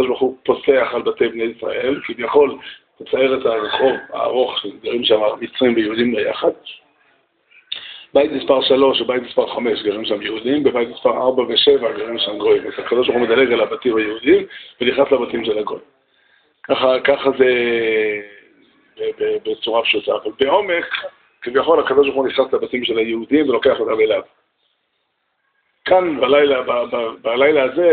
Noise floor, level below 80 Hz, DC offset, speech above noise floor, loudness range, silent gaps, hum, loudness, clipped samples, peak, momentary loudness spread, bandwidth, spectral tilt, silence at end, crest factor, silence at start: -69 dBFS; -56 dBFS; under 0.1%; 52 dB; 3 LU; none; none; -17 LUFS; under 0.1%; -2 dBFS; 9 LU; 4.6 kHz; -1.5 dB/octave; 0 s; 16 dB; 0 s